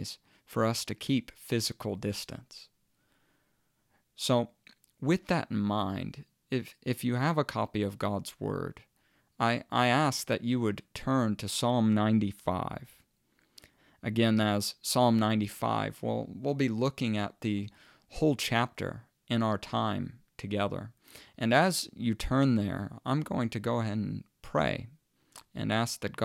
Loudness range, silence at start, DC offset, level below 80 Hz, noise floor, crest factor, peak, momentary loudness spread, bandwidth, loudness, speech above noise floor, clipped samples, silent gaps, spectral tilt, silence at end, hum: 5 LU; 0 s; under 0.1%; -56 dBFS; -74 dBFS; 22 dB; -10 dBFS; 13 LU; 16.5 kHz; -31 LUFS; 44 dB; under 0.1%; none; -5.5 dB/octave; 0 s; none